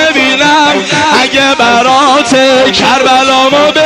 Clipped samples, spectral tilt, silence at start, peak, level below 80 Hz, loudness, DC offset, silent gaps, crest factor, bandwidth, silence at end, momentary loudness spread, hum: 0.1%; -2.5 dB/octave; 0 s; 0 dBFS; -42 dBFS; -6 LUFS; 0.1%; none; 6 dB; 15.5 kHz; 0 s; 1 LU; none